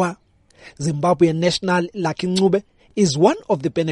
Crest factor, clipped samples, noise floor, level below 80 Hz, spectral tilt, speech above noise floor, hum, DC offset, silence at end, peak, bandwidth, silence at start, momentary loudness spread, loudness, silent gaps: 18 dB; under 0.1%; -52 dBFS; -54 dBFS; -5.5 dB/octave; 34 dB; none; under 0.1%; 0 s; -2 dBFS; 11.5 kHz; 0 s; 8 LU; -19 LUFS; none